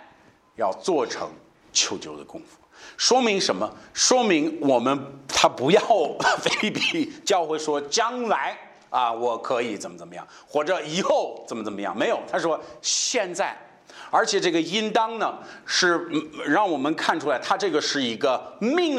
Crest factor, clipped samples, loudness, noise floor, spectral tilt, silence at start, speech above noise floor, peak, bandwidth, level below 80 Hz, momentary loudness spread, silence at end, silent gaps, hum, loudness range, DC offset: 20 dB; under 0.1%; -23 LUFS; -55 dBFS; -2.5 dB/octave; 0 s; 32 dB; -4 dBFS; 13.5 kHz; -68 dBFS; 13 LU; 0 s; none; none; 5 LU; under 0.1%